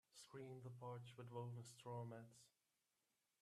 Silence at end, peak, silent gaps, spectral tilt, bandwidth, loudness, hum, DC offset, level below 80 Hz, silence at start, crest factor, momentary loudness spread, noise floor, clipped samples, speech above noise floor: 0.9 s; -38 dBFS; none; -6 dB/octave; 13.5 kHz; -56 LUFS; none; under 0.1%; under -90 dBFS; 0.1 s; 18 dB; 7 LU; -90 dBFS; under 0.1%; 34 dB